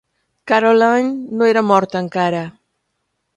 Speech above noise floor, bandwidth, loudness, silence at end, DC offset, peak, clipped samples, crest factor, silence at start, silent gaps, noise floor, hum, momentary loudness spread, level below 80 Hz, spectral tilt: 57 dB; 9 kHz; -15 LUFS; 0.85 s; under 0.1%; 0 dBFS; under 0.1%; 16 dB; 0.45 s; none; -71 dBFS; none; 9 LU; -64 dBFS; -6 dB/octave